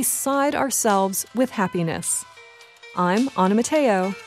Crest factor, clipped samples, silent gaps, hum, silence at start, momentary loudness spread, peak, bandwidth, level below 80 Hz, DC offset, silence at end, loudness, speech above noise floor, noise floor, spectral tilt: 16 dB; under 0.1%; none; none; 0 s; 5 LU; -6 dBFS; 16 kHz; -64 dBFS; under 0.1%; 0 s; -21 LUFS; 26 dB; -47 dBFS; -4 dB/octave